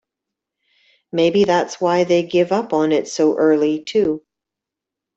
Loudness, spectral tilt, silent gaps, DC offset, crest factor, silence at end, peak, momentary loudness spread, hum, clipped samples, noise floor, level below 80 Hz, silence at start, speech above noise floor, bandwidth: -17 LUFS; -5.5 dB/octave; none; under 0.1%; 16 dB; 1 s; -4 dBFS; 4 LU; none; under 0.1%; -85 dBFS; -60 dBFS; 1.15 s; 68 dB; 8 kHz